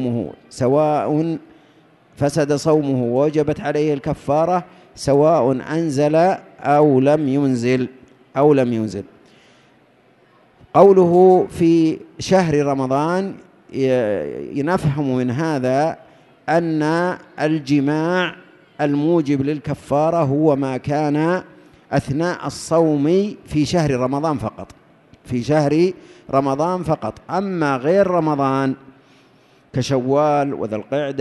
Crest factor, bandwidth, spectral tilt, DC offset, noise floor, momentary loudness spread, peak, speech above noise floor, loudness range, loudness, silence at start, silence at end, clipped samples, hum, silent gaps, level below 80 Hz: 18 dB; 12 kHz; -7 dB/octave; under 0.1%; -54 dBFS; 10 LU; 0 dBFS; 37 dB; 5 LU; -18 LUFS; 0 s; 0 s; under 0.1%; none; none; -50 dBFS